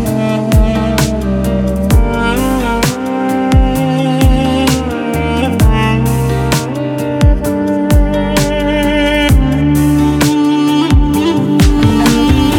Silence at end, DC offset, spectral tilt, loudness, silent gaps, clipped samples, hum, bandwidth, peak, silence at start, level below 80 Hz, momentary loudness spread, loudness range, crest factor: 0 s; under 0.1%; -6 dB/octave; -12 LUFS; none; under 0.1%; none; 18 kHz; 0 dBFS; 0 s; -16 dBFS; 4 LU; 2 LU; 10 dB